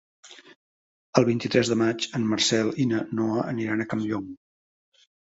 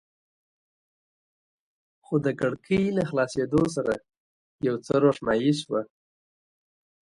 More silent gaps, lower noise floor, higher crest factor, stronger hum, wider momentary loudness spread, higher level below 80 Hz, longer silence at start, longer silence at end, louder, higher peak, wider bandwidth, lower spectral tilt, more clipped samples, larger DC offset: first, 0.56-1.13 s vs 4.17-4.59 s; about the same, under -90 dBFS vs under -90 dBFS; about the same, 24 dB vs 20 dB; neither; about the same, 6 LU vs 8 LU; about the same, -62 dBFS vs -58 dBFS; second, 0.25 s vs 2.1 s; second, 0.9 s vs 1.2 s; about the same, -25 LUFS vs -26 LUFS; first, -4 dBFS vs -8 dBFS; second, 8 kHz vs 11.5 kHz; second, -4.5 dB/octave vs -6.5 dB/octave; neither; neither